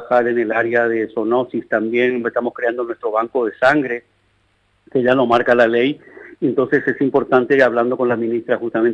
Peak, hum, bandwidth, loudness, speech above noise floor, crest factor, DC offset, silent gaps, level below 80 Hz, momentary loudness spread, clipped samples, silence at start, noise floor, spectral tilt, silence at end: -2 dBFS; none; 8 kHz; -17 LUFS; 44 dB; 14 dB; under 0.1%; none; -60 dBFS; 7 LU; under 0.1%; 0 s; -61 dBFS; -7 dB/octave; 0 s